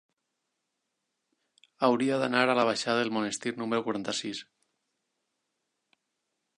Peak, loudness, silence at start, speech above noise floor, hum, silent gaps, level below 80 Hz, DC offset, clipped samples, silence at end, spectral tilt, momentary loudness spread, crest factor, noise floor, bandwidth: -8 dBFS; -28 LUFS; 1.8 s; 54 dB; none; none; -78 dBFS; under 0.1%; under 0.1%; 2.15 s; -4 dB/octave; 8 LU; 24 dB; -82 dBFS; 11 kHz